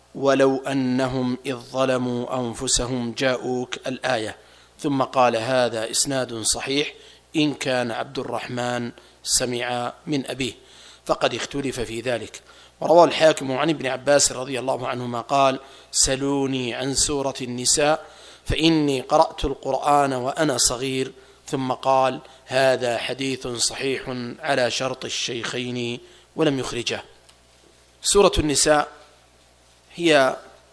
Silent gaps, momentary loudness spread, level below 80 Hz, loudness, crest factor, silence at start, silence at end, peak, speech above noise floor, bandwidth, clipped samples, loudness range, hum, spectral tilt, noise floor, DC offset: none; 11 LU; -44 dBFS; -22 LUFS; 22 dB; 0.15 s; 0.25 s; 0 dBFS; 33 dB; 11 kHz; under 0.1%; 5 LU; none; -3 dB/octave; -55 dBFS; under 0.1%